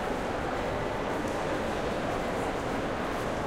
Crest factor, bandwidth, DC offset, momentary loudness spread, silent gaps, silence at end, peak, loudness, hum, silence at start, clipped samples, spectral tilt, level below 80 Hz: 12 dB; 16 kHz; under 0.1%; 1 LU; none; 0 s; -18 dBFS; -31 LUFS; none; 0 s; under 0.1%; -5.5 dB/octave; -44 dBFS